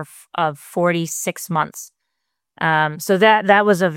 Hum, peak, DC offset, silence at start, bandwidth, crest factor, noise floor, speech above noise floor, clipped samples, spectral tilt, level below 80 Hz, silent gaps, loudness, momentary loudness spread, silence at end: none; -2 dBFS; under 0.1%; 0 s; 17 kHz; 18 dB; -78 dBFS; 60 dB; under 0.1%; -4.5 dB/octave; -68 dBFS; none; -18 LUFS; 11 LU; 0 s